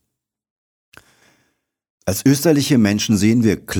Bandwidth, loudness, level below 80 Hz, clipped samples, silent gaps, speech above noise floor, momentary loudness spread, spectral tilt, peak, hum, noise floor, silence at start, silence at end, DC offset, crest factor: over 20 kHz; -16 LUFS; -52 dBFS; under 0.1%; none; 63 dB; 6 LU; -5.5 dB/octave; -4 dBFS; none; -78 dBFS; 2.05 s; 0 s; under 0.1%; 16 dB